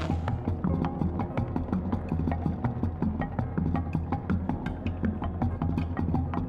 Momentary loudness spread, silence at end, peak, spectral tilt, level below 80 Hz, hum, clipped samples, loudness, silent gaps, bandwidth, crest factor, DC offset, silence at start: 2 LU; 0 s; -16 dBFS; -10 dB/octave; -38 dBFS; none; under 0.1%; -30 LUFS; none; 5.4 kHz; 14 dB; under 0.1%; 0 s